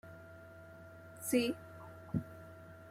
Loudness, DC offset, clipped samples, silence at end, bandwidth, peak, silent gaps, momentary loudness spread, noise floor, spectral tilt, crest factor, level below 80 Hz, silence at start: -38 LUFS; under 0.1%; under 0.1%; 0 s; 16 kHz; -18 dBFS; none; 21 LU; -54 dBFS; -5 dB/octave; 22 dB; -70 dBFS; 0.05 s